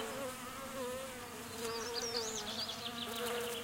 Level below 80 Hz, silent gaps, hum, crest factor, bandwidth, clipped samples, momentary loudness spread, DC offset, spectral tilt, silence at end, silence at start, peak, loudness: -66 dBFS; none; none; 20 dB; 17 kHz; under 0.1%; 7 LU; under 0.1%; -2 dB/octave; 0 s; 0 s; -22 dBFS; -40 LUFS